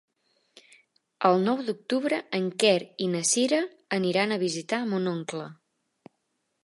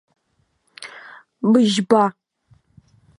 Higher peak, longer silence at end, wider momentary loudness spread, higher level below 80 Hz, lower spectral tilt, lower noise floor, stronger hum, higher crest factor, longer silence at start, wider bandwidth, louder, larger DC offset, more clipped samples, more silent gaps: second, -6 dBFS vs -2 dBFS; about the same, 1.1 s vs 1.1 s; second, 8 LU vs 22 LU; second, -78 dBFS vs -68 dBFS; second, -4 dB/octave vs -5.5 dB/octave; first, -77 dBFS vs -67 dBFS; neither; about the same, 20 dB vs 20 dB; first, 1.2 s vs 0.8 s; about the same, 11.5 kHz vs 11.5 kHz; second, -26 LUFS vs -17 LUFS; neither; neither; neither